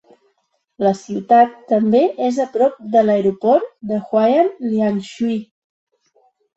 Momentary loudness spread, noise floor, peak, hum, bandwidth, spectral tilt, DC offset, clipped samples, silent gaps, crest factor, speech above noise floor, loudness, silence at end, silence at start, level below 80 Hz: 8 LU; -68 dBFS; -2 dBFS; none; 8 kHz; -7 dB/octave; under 0.1%; under 0.1%; none; 16 dB; 51 dB; -17 LUFS; 1.15 s; 0.8 s; -64 dBFS